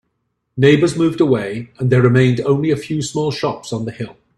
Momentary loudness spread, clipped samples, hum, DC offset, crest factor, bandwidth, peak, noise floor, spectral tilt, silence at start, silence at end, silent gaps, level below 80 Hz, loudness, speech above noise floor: 13 LU; under 0.1%; none; under 0.1%; 16 dB; 11.5 kHz; 0 dBFS; -71 dBFS; -6.5 dB/octave; 0.55 s; 0.25 s; none; -52 dBFS; -16 LUFS; 55 dB